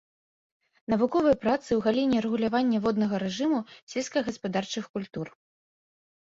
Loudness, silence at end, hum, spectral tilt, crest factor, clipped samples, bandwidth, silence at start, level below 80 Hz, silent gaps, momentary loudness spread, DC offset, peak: -27 LUFS; 0.95 s; none; -5.5 dB/octave; 16 dB; under 0.1%; 7.8 kHz; 0.9 s; -62 dBFS; 3.82-3.87 s, 4.89-4.94 s; 12 LU; under 0.1%; -12 dBFS